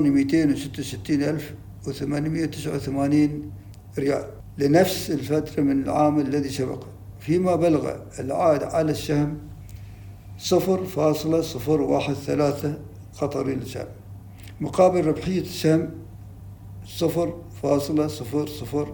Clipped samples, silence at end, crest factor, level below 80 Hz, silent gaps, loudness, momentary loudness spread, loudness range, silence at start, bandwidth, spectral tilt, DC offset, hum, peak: under 0.1%; 0 s; 20 dB; -48 dBFS; none; -24 LUFS; 21 LU; 3 LU; 0 s; 19 kHz; -6.5 dB/octave; under 0.1%; none; -4 dBFS